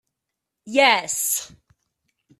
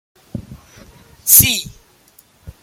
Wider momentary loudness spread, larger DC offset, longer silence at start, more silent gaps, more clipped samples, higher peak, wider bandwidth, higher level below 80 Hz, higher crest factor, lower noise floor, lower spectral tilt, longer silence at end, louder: second, 8 LU vs 25 LU; neither; first, 0.65 s vs 0.35 s; neither; second, under 0.1% vs 0.2%; about the same, -2 dBFS vs 0 dBFS; second, 14.5 kHz vs 17 kHz; second, -68 dBFS vs -42 dBFS; about the same, 22 dB vs 20 dB; first, -83 dBFS vs -51 dBFS; about the same, 0 dB/octave vs -1 dB/octave; first, 0.95 s vs 0.15 s; second, -19 LUFS vs -11 LUFS